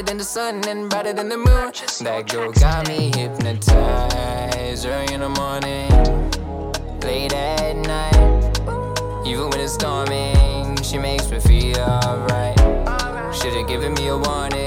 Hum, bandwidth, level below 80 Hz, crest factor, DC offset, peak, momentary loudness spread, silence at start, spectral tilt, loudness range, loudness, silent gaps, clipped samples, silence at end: none; 16 kHz; -20 dBFS; 18 dB; under 0.1%; 0 dBFS; 8 LU; 0 s; -5 dB/octave; 3 LU; -20 LUFS; none; under 0.1%; 0 s